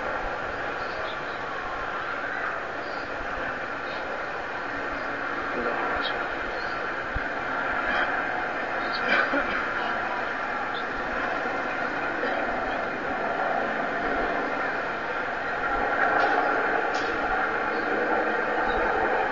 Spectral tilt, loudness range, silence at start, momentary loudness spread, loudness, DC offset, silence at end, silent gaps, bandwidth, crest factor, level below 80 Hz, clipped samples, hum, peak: -4.5 dB/octave; 6 LU; 0 s; 7 LU; -27 LUFS; 0.5%; 0 s; none; 7.4 kHz; 18 dB; -48 dBFS; under 0.1%; none; -10 dBFS